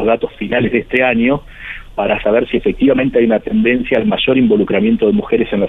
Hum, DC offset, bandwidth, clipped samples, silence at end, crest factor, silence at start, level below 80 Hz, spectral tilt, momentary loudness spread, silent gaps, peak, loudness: none; under 0.1%; 4 kHz; under 0.1%; 0 s; 14 dB; 0 s; -36 dBFS; -8.5 dB/octave; 6 LU; none; 0 dBFS; -14 LUFS